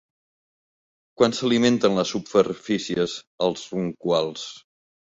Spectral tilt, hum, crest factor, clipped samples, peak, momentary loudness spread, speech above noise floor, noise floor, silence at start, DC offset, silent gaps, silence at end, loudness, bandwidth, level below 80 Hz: -5 dB/octave; none; 20 dB; under 0.1%; -4 dBFS; 9 LU; over 67 dB; under -90 dBFS; 1.2 s; under 0.1%; 3.27-3.38 s; 0.45 s; -23 LUFS; 8 kHz; -62 dBFS